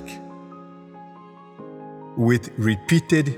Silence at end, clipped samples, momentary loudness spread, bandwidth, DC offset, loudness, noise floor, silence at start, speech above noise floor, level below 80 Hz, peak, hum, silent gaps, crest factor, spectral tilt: 0 s; under 0.1%; 24 LU; 16 kHz; under 0.1%; -21 LUFS; -45 dBFS; 0 s; 25 dB; -58 dBFS; -4 dBFS; none; none; 20 dB; -6.5 dB/octave